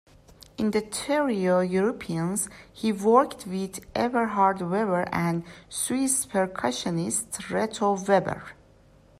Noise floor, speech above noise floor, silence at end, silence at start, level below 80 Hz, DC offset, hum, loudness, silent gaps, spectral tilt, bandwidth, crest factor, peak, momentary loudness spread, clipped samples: -56 dBFS; 30 dB; 0.65 s; 0.6 s; -58 dBFS; under 0.1%; none; -26 LUFS; none; -4.5 dB/octave; 15.5 kHz; 20 dB; -6 dBFS; 10 LU; under 0.1%